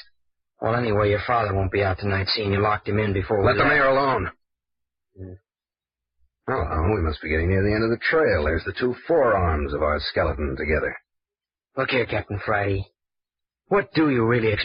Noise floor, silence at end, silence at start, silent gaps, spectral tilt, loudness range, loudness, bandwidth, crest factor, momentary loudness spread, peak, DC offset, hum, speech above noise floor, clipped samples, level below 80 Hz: under -90 dBFS; 0 s; 0.6 s; none; -10 dB/octave; 6 LU; -22 LUFS; 5.4 kHz; 16 dB; 9 LU; -8 dBFS; under 0.1%; none; over 68 dB; under 0.1%; -38 dBFS